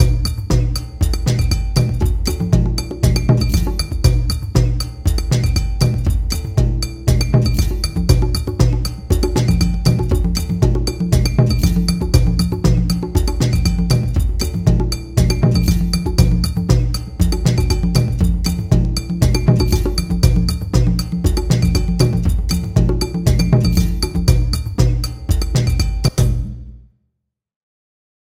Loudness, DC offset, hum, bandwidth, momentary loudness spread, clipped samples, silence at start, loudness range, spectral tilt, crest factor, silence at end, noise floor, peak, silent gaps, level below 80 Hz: -17 LUFS; under 0.1%; none; 16 kHz; 5 LU; under 0.1%; 0 s; 2 LU; -6 dB/octave; 16 dB; 1.5 s; -75 dBFS; 0 dBFS; none; -20 dBFS